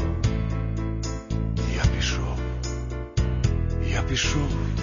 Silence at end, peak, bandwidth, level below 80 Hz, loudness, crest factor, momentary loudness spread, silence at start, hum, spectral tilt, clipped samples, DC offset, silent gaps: 0 s; -8 dBFS; 7.4 kHz; -28 dBFS; -26 LUFS; 18 dB; 6 LU; 0 s; none; -5 dB/octave; under 0.1%; under 0.1%; none